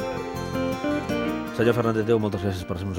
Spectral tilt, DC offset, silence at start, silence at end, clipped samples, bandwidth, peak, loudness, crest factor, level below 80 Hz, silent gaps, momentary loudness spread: -6.5 dB/octave; under 0.1%; 0 s; 0 s; under 0.1%; 17 kHz; -6 dBFS; -25 LUFS; 18 dB; -50 dBFS; none; 8 LU